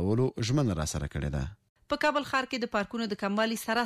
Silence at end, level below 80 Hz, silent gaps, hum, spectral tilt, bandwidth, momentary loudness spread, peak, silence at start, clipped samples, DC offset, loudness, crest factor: 0 s; -46 dBFS; 1.69-1.76 s; none; -5 dB/octave; 15.5 kHz; 6 LU; -16 dBFS; 0 s; under 0.1%; under 0.1%; -30 LUFS; 14 dB